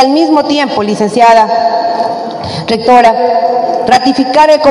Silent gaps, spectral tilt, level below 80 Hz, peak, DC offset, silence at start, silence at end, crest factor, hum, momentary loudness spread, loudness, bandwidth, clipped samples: none; -4.5 dB/octave; -48 dBFS; 0 dBFS; under 0.1%; 0 s; 0 s; 8 dB; none; 9 LU; -9 LUFS; 12 kHz; 4%